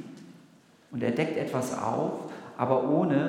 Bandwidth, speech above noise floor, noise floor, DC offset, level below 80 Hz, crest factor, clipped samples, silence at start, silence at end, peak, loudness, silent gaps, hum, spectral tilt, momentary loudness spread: 17 kHz; 30 dB; -58 dBFS; under 0.1%; -76 dBFS; 20 dB; under 0.1%; 0 s; 0 s; -10 dBFS; -29 LUFS; none; none; -7 dB/octave; 16 LU